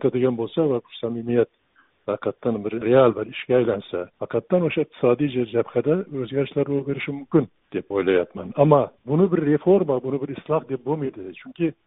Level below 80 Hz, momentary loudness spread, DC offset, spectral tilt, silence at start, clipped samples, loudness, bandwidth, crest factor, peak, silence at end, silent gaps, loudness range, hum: -60 dBFS; 11 LU; under 0.1%; -7 dB/octave; 0 s; under 0.1%; -23 LUFS; 4 kHz; 20 dB; -2 dBFS; 0.15 s; none; 2 LU; none